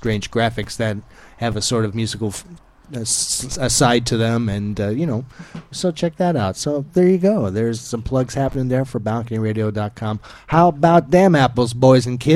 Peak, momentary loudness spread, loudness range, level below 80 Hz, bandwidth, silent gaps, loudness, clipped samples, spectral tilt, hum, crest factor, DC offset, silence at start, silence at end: 0 dBFS; 13 LU; 5 LU; -42 dBFS; 15.5 kHz; none; -18 LUFS; under 0.1%; -5 dB/octave; none; 18 dB; under 0.1%; 0 s; 0 s